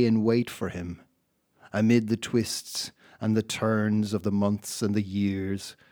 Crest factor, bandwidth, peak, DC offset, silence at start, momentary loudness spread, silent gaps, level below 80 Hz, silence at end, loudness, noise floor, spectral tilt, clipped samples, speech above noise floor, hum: 18 dB; 19 kHz; -8 dBFS; under 0.1%; 0 s; 11 LU; none; -62 dBFS; 0.2 s; -27 LUFS; -72 dBFS; -5.5 dB/octave; under 0.1%; 46 dB; none